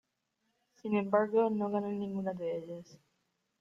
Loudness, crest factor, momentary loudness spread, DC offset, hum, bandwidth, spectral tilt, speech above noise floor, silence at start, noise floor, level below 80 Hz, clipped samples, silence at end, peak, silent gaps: -33 LUFS; 20 dB; 15 LU; under 0.1%; none; 7 kHz; -8.5 dB/octave; 49 dB; 0.85 s; -81 dBFS; -78 dBFS; under 0.1%; 0.65 s; -16 dBFS; none